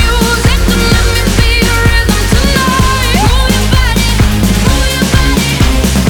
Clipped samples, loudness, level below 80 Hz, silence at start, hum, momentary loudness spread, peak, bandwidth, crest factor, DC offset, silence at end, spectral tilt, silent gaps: 0.3%; -10 LUFS; -12 dBFS; 0 s; none; 1 LU; 0 dBFS; over 20 kHz; 8 dB; under 0.1%; 0 s; -4.5 dB/octave; none